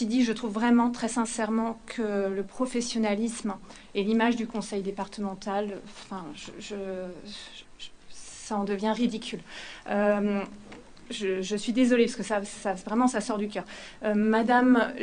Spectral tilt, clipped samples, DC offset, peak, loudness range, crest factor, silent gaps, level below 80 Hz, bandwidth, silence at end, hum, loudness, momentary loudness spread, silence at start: -4.5 dB/octave; under 0.1%; under 0.1%; -10 dBFS; 8 LU; 18 dB; none; -60 dBFS; 10 kHz; 0 s; none; -28 LUFS; 18 LU; 0 s